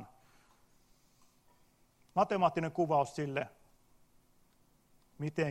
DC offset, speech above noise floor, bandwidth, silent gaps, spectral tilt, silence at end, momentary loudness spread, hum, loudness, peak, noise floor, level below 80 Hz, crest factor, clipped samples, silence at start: under 0.1%; 36 dB; 15 kHz; none; -6.5 dB/octave; 0 s; 10 LU; none; -34 LUFS; -16 dBFS; -68 dBFS; -72 dBFS; 22 dB; under 0.1%; 0 s